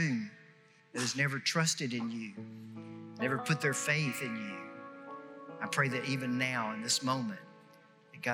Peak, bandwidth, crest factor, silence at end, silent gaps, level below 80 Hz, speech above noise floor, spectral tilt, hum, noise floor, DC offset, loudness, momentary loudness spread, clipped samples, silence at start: -16 dBFS; 16 kHz; 20 dB; 0 s; none; under -90 dBFS; 28 dB; -3.5 dB/octave; none; -62 dBFS; under 0.1%; -33 LUFS; 17 LU; under 0.1%; 0 s